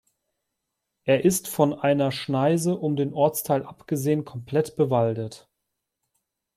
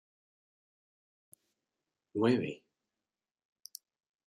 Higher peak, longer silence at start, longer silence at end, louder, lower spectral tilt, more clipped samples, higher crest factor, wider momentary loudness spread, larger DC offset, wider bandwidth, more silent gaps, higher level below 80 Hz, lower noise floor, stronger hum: first, -6 dBFS vs -16 dBFS; second, 1.05 s vs 2.15 s; second, 1.2 s vs 1.7 s; first, -24 LUFS vs -33 LUFS; about the same, -6 dB/octave vs -6.5 dB/octave; neither; about the same, 20 dB vs 24 dB; second, 6 LU vs 22 LU; neither; first, 16.5 kHz vs 13.5 kHz; neither; first, -64 dBFS vs -82 dBFS; second, -81 dBFS vs under -90 dBFS; neither